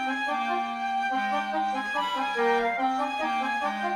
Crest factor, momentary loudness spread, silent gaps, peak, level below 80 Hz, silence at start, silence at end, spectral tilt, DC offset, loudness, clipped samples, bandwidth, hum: 14 dB; 4 LU; none; -12 dBFS; -66 dBFS; 0 s; 0 s; -3.5 dB/octave; under 0.1%; -27 LUFS; under 0.1%; 13.5 kHz; none